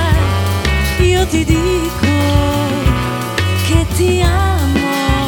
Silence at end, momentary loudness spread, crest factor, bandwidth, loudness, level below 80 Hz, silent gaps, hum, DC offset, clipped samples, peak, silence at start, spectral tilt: 0 s; 3 LU; 12 dB; 18.5 kHz; -14 LUFS; -20 dBFS; none; none; under 0.1%; under 0.1%; -2 dBFS; 0 s; -5.5 dB/octave